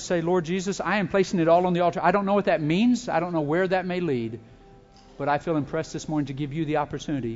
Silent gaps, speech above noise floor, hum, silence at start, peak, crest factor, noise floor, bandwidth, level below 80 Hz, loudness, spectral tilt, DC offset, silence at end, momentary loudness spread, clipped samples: none; 27 dB; none; 0 s; -8 dBFS; 18 dB; -51 dBFS; 8 kHz; -54 dBFS; -24 LUFS; -6 dB/octave; under 0.1%; 0 s; 9 LU; under 0.1%